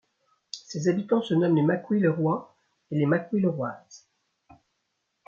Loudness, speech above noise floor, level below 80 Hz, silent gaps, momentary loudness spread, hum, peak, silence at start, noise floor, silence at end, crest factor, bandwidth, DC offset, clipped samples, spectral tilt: -26 LUFS; 53 dB; -72 dBFS; none; 13 LU; none; -12 dBFS; 0.55 s; -78 dBFS; 1.3 s; 16 dB; 7.4 kHz; under 0.1%; under 0.1%; -7.5 dB/octave